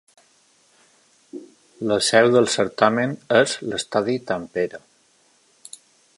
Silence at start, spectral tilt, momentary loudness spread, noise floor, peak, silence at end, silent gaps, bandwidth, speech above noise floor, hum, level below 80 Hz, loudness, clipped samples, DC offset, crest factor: 1.35 s; -4 dB/octave; 25 LU; -60 dBFS; -2 dBFS; 1.4 s; none; 11.5 kHz; 40 dB; none; -64 dBFS; -20 LUFS; under 0.1%; under 0.1%; 22 dB